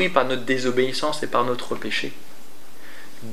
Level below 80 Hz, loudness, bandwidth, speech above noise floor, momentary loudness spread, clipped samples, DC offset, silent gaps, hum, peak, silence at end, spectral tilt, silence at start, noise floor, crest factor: -70 dBFS; -24 LUFS; 16 kHz; 24 dB; 21 LU; under 0.1%; 5%; none; none; -2 dBFS; 0 s; -4 dB/octave; 0 s; -48 dBFS; 22 dB